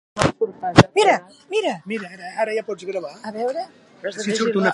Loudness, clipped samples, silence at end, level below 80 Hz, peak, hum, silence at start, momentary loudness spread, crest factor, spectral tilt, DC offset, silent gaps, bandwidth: -21 LUFS; under 0.1%; 0 s; -46 dBFS; 0 dBFS; none; 0.15 s; 16 LU; 22 dB; -5 dB/octave; under 0.1%; none; 11.5 kHz